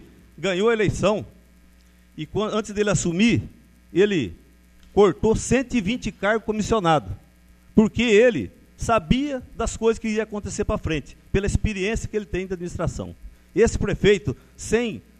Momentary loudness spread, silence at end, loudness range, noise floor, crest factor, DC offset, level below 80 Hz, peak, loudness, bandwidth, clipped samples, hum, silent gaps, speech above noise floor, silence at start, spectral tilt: 11 LU; 0.2 s; 4 LU; -53 dBFS; 22 dB; under 0.1%; -38 dBFS; -2 dBFS; -22 LUFS; 13 kHz; under 0.1%; none; none; 31 dB; 0.4 s; -5.5 dB/octave